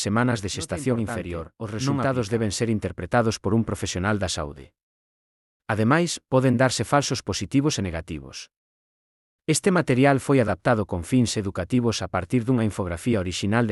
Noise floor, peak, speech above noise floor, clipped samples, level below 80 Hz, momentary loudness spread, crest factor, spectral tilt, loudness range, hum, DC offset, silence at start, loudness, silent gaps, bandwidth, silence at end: under -90 dBFS; -6 dBFS; over 67 dB; under 0.1%; -52 dBFS; 10 LU; 18 dB; -5.5 dB/octave; 3 LU; none; under 0.1%; 0 s; -24 LUFS; 4.83-5.60 s, 8.57-9.39 s; 12 kHz; 0 s